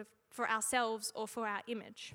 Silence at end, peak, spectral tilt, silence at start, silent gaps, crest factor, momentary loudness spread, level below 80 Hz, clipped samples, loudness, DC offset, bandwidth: 0 s; -18 dBFS; -1.5 dB/octave; 0 s; none; 20 dB; 11 LU; -80 dBFS; under 0.1%; -37 LUFS; under 0.1%; 18 kHz